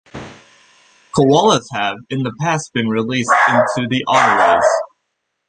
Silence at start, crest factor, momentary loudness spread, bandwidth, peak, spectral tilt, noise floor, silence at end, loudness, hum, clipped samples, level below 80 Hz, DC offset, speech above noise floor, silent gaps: 0.15 s; 16 dB; 11 LU; 10 kHz; 0 dBFS; -4.5 dB/octave; -73 dBFS; 0.65 s; -15 LUFS; none; under 0.1%; -54 dBFS; under 0.1%; 58 dB; none